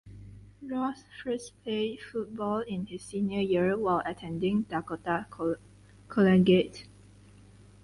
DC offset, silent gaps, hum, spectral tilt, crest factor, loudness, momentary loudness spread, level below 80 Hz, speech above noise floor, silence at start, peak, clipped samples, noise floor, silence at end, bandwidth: under 0.1%; none; 50 Hz at -50 dBFS; -7 dB/octave; 18 dB; -30 LUFS; 14 LU; -58 dBFS; 26 dB; 0.05 s; -12 dBFS; under 0.1%; -54 dBFS; 1 s; 11.5 kHz